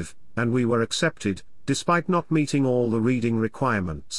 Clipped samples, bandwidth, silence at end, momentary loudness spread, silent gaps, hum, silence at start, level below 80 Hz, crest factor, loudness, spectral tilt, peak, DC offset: under 0.1%; 12 kHz; 0 s; 6 LU; none; none; 0 s; -54 dBFS; 14 dB; -24 LUFS; -5.5 dB/octave; -8 dBFS; 0.8%